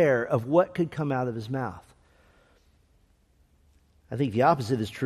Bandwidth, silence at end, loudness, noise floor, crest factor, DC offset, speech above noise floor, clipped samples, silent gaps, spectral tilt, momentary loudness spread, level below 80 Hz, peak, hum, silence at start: 13.5 kHz; 0 s; -26 LUFS; -64 dBFS; 20 dB; under 0.1%; 38 dB; under 0.1%; none; -7.5 dB/octave; 11 LU; -62 dBFS; -8 dBFS; none; 0 s